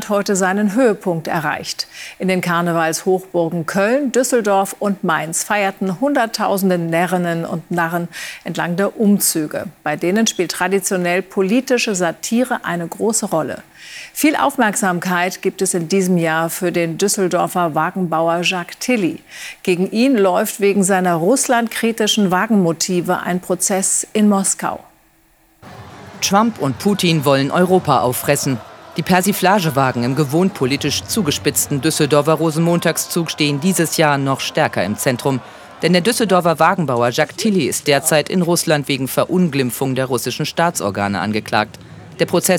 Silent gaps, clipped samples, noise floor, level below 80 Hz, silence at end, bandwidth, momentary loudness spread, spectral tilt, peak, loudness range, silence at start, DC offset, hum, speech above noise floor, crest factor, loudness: none; under 0.1%; -54 dBFS; -58 dBFS; 0 s; 19.5 kHz; 7 LU; -4.5 dB/octave; 0 dBFS; 3 LU; 0 s; under 0.1%; none; 37 dB; 16 dB; -17 LUFS